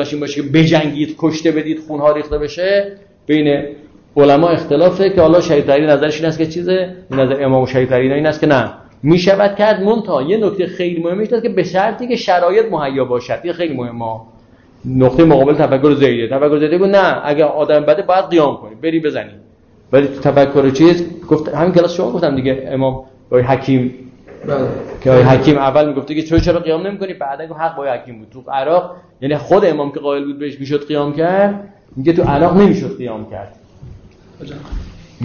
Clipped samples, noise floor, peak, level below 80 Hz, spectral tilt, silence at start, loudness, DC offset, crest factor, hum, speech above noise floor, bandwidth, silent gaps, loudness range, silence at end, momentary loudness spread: under 0.1%; -45 dBFS; 0 dBFS; -38 dBFS; -7.5 dB/octave; 0 s; -14 LUFS; under 0.1%; 12 dB; none; 32 dB; 7 kHz; none; 5 LU; 0 s; 13 LU